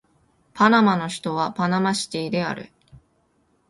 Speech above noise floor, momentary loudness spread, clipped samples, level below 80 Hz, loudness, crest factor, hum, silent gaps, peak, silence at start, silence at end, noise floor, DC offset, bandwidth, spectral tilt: 44 dB; 10 LU; under 0.1%; -62 dBFS; -21 LUFS; 22 dB; none; none; -2 dBFS; 0.55 s; 1.05 s; -65 dBFS; under 0.1%; 11.5 kHz; -5 dB/octave